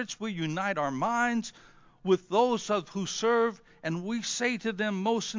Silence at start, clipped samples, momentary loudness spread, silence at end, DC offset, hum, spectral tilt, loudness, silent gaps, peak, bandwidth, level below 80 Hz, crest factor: 0 s; under 0.1%; 8 LU; 0 s; under 0.1%; none; -4 dB/octave; -29 LUFS; none; -12 dBFS; 7.6 kHz; -70 dBFS; 18 dB